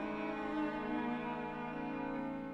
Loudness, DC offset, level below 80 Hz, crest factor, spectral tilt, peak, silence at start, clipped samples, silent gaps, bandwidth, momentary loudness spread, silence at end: -40 LUFS; under 0.1%; -62 dBFS; 12 dB; -7.5 dB/octave; -28 dBFS; 0 s; under 0.1%; none; 7.8 kHz; 3 LU; 0 s